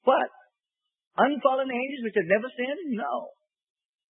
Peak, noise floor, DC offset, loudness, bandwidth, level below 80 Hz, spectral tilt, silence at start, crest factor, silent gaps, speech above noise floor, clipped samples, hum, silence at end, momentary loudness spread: -8 dBFS; -87 dBFS; under 0.1%; -27 LUFS; 4 kHz; -80 dBFS; -9.5 dB/octave; 0.05 s; 20 dB; 1.07-1.11 s; 61 dB; under 0.1%; none; 0.85 s; 11 LU